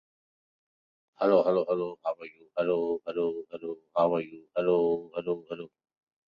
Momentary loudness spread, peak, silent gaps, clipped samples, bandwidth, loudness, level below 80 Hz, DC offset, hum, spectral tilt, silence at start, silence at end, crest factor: 15 LU; -10 dBFS; none; under 0.1%; 5.4 kHz; -29 LUFS; -74 dBFS; under 0.1%; none; -9 dB/octave; 1.2 s; 0.6 s; 20 dB